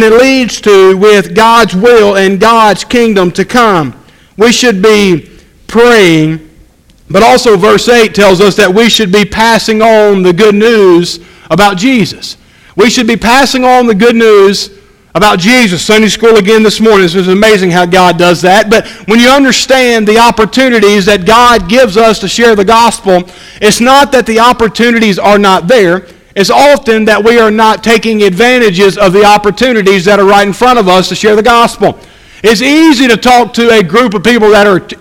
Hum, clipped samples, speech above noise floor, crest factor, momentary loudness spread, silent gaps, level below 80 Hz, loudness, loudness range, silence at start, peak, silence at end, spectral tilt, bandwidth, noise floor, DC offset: none; 6%; 35 dB; 6 dB; 5 LU; none; -34 dBFS; -5 LUFS; 2 LU; 0 s; 0 dBFS; 0.05 s; -4 dB/octave; 17 kHz; -40 dBFS; under 0.1%